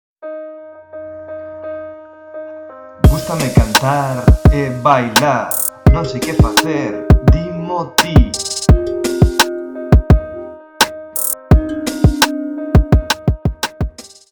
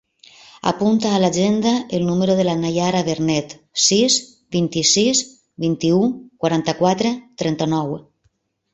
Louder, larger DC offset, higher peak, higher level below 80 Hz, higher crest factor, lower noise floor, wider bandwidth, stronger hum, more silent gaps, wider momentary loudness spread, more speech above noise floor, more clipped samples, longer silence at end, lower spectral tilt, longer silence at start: first, -14 LUFS vs -18 LUFS; neither; about the same, 0 dBFS vs -2 dBFS; first, -20 dBFS vs -56 dBFS; about the same, 14 dB vs 16 dB; second, -34 dBFS vs -65 dBFS; first, 19.5 kHz vs 8.2 kHz; neither; neither; first, 19 LU vs 9 LU; second, 21 dB vs 47 dB; neither; second, 0.25 s vs 0.7 s; about the same, -5 dB/octave vs -4 dB/octave; second, 0.2 s vs 0.65 s